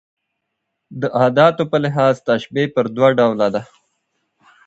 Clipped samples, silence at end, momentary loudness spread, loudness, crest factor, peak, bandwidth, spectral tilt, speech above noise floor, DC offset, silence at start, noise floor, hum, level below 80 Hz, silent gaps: under 0.1%; 1 s; 9 LU; -16 LUFS; 18 dB; 0 dBFS; 8 kHz; -7 dB/octave; 60 dB; under 0.1%; 0.9 s; -76 dBFS; none; -60 dBFS; none